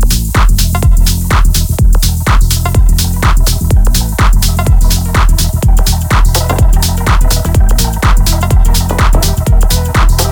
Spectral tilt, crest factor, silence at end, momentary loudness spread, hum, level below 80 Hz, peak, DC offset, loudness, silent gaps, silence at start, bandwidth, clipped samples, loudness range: -4.5 dB/octave; 8 dB; 0 s; 1 LU; none; -8 dBFS; 0 dBFS; under 0.1%; -11 LUFS; none; 0 s; over 20 kHz; under 0.1%; 0 LU